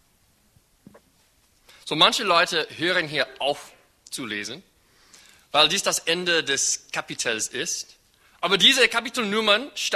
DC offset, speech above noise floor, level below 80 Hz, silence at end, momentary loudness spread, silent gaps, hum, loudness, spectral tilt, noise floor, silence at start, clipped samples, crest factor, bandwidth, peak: under 0.1%; 39 dB; -64 dBFS; 0 s; 14 LU; none; none; -21 LUFS; -1 dB/octave; -62 dBFS; 1.85 s; under 0.1%; 22 dB; 13.5 kHz; -2 dBFS